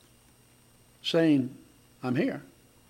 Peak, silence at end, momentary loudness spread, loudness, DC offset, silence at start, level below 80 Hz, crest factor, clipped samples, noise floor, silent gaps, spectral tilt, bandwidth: -12 dBFS; 0.45 s; 14 LU; -28 LUFS; under 0.1%; 1.05 s; -70 dBFS; 18 dB; under 0.1%; -60 dBFS; none; -6.5 dB/octave; 16 kHz